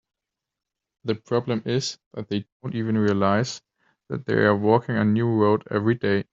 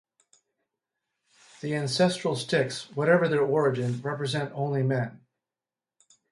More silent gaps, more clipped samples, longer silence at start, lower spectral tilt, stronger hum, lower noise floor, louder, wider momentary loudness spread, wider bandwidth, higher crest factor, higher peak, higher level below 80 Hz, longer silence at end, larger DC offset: first, 2.06-2.11 s, 2.52-2.60 s vs none; neither; second, 1.05 s vs 1.65 s; about the same, -5.5 dB/octave vs -5.5 dB/octave; neither; second, -86 dBFS vs under -90 dBFS; first, -23 LUFS vs -27 LUFS; first, 12 LU vs 8 LU; second, 7.8 kHz vs 11.5 kHz; about the same, 20 dB vs 20 dB; first, -4 dBFS vs -10 dBFS; first, -62 dBFS vs -70 dBFS; second, 0.1 s vs 1.15 s; neither